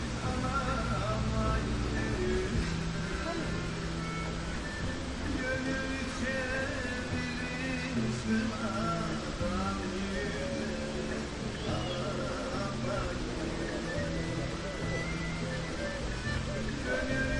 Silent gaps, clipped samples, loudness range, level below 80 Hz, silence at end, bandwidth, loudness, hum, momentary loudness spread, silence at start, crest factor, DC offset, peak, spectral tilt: none; under 0.1%; 2 LU; -42 dBFS; 0 s; 11.5 kHz; -34 LUFS; none; 4 LU; 0 s; 16 dB; under 0.1%; -16 dBFS; -5 dB/octave